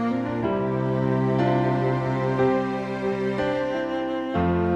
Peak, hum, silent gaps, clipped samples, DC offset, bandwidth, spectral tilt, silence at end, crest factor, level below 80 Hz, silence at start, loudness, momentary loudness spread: -10 dBFS; none; none; under 0.1%; under 0.1%; 7.8 kHz; -8.5 dB/octave; 0 s; 14 dB; -48 dBFS; 0 s; -24 LUFS; 5 LU